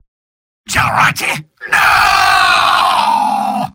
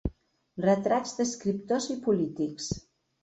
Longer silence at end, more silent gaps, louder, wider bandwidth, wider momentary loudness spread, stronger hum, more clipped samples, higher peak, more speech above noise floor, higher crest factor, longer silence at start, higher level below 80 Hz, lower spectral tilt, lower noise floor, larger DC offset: second, 0.05 s vs 0.45 s; neither; first, -11 LUFS vs -29 LUFS; first, 17 kHz vs 8.4 kHz; about the same, 9 LU vs 11 LU; neither; neither; first, 0 dBFS vs -12 dBFS; first, over 78 dB vs 20 dB; about the same, 12 dB vs 16 dB; first, 0.7 s vs 0.05 s; first, -42 dBFS vs -48 dBFS; second, -2 dB/octave vs -5.5 dB/octave; first, under -90 dBFS vs -48 dBFS; neither